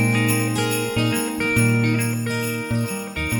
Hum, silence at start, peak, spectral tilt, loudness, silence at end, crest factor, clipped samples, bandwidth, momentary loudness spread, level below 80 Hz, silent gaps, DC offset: none; 0 s; -6 dBFS; -5 dB/octave; -21 LUFS; 0 s; 14 dB; under 0.1%; 20 kHz; 6 LU; -44 dBFS; none; under 0.1%